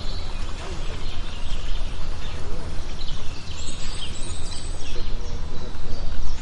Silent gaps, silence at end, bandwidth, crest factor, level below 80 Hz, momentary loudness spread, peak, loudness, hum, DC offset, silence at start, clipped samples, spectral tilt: none; 0 s; 9.2 kHz; 12 dB; -26 dBFS; 2 LU; -6 dBFS; -34 LUFS; none; under 0.1%; 0 s; under 0.1%; -4 dB/octave